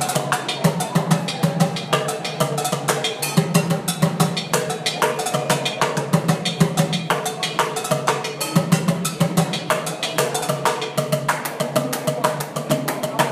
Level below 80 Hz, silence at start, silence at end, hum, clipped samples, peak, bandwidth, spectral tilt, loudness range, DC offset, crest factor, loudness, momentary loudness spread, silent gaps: -58 dBFS; 0 s; 0 s; none; under 0.1%; -2 dBFS; 16 kHz; -4.5 dB/octave; 1 LU; under 0.1%; 18 dB; -21 LUFS; 3 LU; none